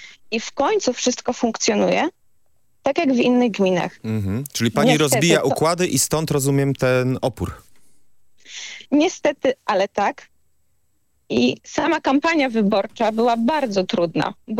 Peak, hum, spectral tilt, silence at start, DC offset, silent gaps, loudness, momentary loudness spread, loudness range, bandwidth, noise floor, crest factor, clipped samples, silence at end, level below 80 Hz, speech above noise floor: 0 dBFS; none; -4.5 dB/octave; 0 s; under 0.1%; none; -20 LUFS; 9 LU; 5 LU; 16.5 kHz; -70 dBFS; 20 dB; under 0.1%; 0 s; -54 dBFS; 50 dB